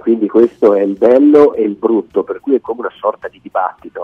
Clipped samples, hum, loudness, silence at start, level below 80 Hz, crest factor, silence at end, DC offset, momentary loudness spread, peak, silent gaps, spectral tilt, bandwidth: 0.3%; none; -13 LUFS; 0.05 s; -56 dBFS; 12 dB; 0 s; under 0.1%; 12 LU; 0 dBFS; none; -8.5 dB/octave; 5.6 kHz